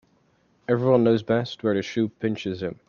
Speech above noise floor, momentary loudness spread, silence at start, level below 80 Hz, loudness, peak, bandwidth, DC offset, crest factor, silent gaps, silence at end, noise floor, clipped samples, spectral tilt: 41 dB; 10 LU; 0.7 s; -64 dBFS; -24 LUFS; -6 dBFS; 7.2 kHz; under 0.1%; 18 dB; none; 0.15 s; -64 dBFS; under 0.1%; -7.5 dB/octave